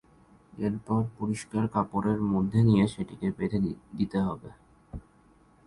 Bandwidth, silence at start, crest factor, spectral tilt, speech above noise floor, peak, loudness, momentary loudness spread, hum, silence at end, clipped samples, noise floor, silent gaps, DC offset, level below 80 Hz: 11.5 kHz; 0.55 s; 18 dB; -8 dB/octave; 33 dB; -10 dBFS; -28 LUFS; 15 LU; none; 0.65 s; under 0.1%; -60 dBFS; none; under 0.1%; -52 dBFS